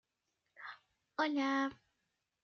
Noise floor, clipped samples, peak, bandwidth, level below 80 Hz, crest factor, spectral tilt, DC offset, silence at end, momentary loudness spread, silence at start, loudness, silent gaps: -86 dBFS; under 0.1%; -22 dBFS; 6.8 kHz; -84 dBFS; 18 dB; -0.5 dB/octave; under 0.1%; 0.7 s; 18 LU; 0.6 s; -36 LUFS; none